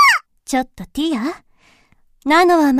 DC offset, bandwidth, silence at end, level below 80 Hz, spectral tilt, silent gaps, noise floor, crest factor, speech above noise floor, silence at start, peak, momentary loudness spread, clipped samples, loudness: under 0.1%; 15.5 kHz; 0 s; -48 dBFS; -3 dB/octave; none; -54 dBFS; 16 dB; 38 dB; 0 s; -2 dBFS; 15 LU; under 0.1%; -17 LUFS